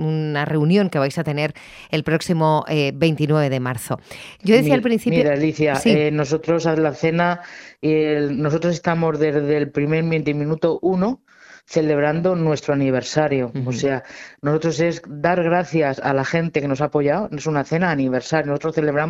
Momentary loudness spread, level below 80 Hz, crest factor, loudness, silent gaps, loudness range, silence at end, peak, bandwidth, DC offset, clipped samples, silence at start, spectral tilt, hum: 7 LU; -54 dBFS; 18 dB; -20 LUFS; none; 2 LU; 0 s; 0 dBFS; 15.5 kHz; under 0.1%; under 0.1%; 0 s; -6.5 dB/octave; none